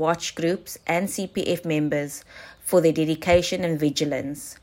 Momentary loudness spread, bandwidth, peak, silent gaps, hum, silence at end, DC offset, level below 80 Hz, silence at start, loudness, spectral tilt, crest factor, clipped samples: 12 LU; 16.5 kHz; -6 dBFS; none; none; 0.1 s; under 0.1%; -50 dBFS; 0 s; -24 LUFS; -5 dB/octave; 18 dB; under 0.1%